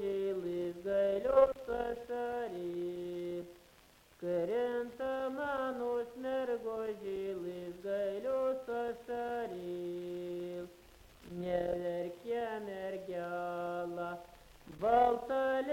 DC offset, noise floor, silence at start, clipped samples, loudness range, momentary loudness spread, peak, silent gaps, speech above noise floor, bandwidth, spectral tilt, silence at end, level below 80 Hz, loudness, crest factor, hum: under 0.1%; -63 dBFS; 0 s; under 0.1%; 5 LU; 11 LU; -14 dBFS; none; 30 dB; 16.5 kHz; -6.5 dB/octave; 0 s; -64 dBFS; -37 LUFS; 22 dB; none